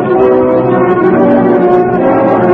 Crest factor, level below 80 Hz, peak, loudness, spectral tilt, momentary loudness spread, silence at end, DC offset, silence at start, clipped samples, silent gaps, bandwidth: 8 dB; -40 dBFS; 0 dBFS; -8 LUFS; -10.5 dB/octave; 2 LU; 0 s; under 0.1%; 0 s; under 0.1%; none; 4.2 kHz